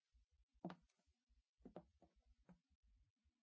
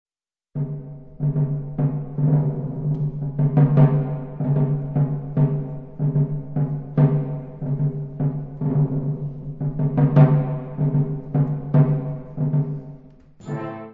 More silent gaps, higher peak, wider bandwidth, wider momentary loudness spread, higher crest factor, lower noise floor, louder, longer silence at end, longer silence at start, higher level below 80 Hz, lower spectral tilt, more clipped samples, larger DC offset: first, 0.43-0.49 s, 1.23-1.27 s, 1.49-1.58 s, 2.75-2.83 s, 3.10-3.16 s vs none; second, -38 dBFS vs -2 dBFS; first, 6.2 kHz vs 2.8 kHz; second, 8 LU vs 13 LU; first, 28 dB vs 18 dB; first, -80 dBFS vs -48 dBFS; second, -61 LUFS vs -22 LUFS; first, 0.15 s vs 0 s; second, 0.15 s vs 0.55 s; second, -82 dBFS vs -46 dBFS; second, -7 dB/octave vs -12.5 dB/octave; neither; neither